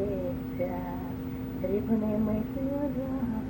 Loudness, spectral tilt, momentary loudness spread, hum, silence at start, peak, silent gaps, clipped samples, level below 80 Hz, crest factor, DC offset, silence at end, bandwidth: -31 LUFS; -9.5 dB/octave; 7 LU; none; 0 s; -16 dBFS; none; under 0.1%; -46 dBFS; 14 dB; under 0.1%; 0 s; 16.5 kHz